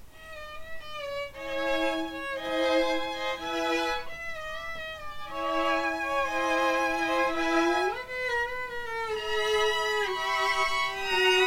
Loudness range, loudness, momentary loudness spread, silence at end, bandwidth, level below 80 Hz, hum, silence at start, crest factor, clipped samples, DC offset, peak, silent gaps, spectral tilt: 3 LU; -28 LUFS; 12 LU; 0 s; 17 kHz; -52 dBFS; none; 0 s; 18 dB; under 0.1%; under 0.1%; -12 dBFS; none; -2.5 dB/octave